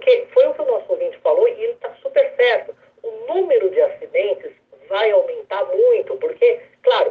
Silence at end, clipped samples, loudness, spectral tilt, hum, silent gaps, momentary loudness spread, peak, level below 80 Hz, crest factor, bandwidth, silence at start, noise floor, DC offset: 0 s; under 0.1%; -18 LUFS; -4.5 dB/octave; none; none; 11 LU; -4 dBFS; -74 dBFS; 14 dB; 4.9 kHz; 0 s; -38 dBFS; under 0.1%